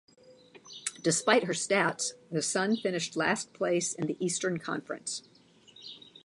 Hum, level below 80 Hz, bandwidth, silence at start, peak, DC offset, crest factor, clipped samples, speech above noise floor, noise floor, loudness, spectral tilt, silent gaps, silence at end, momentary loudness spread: none; -76 dBFS; 11.5 kHz; 0.3 s; -6 dBFS; under 0.1%; 24 dB; under 0.1%; 27 dB; -57 dBFS; -30 LUFS; -3 dB/octave; none; 0.15 s; 13 LU